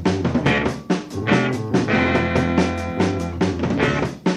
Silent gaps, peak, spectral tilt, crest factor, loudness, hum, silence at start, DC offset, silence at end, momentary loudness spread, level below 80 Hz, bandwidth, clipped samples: none; -4 dBFS; -6.5 dB/octave; 16 dB; -20 LUFS; none; 0 s; under 0.1%; 0 s; 5 LU; -40 dBFS; 12 kHz; under 0.1%